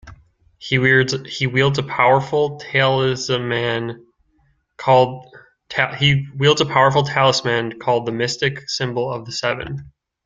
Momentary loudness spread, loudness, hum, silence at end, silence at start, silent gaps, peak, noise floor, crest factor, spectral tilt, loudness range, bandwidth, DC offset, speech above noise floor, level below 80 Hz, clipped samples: 10 LU; -18 LUFS; none; 0.4 s; 0.05 s; none; -2 dBFS; -62 dBFS; 18 dB; -5 dB/octave; 3 LU; 7.8 kHz; under 0.1%; 44 dB; -52 dBFS; under 0.1%